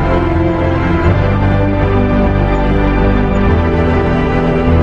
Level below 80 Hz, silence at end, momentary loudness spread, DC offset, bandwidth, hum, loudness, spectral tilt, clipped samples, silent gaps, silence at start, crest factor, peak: -18 dBFS; 0 s; 1 LU; under 0.1%; 7.2 kHz; none; -13 LUFS; -9 dB/octave; under 0.1%; none; 0 s; 10 dB; 0 dBFS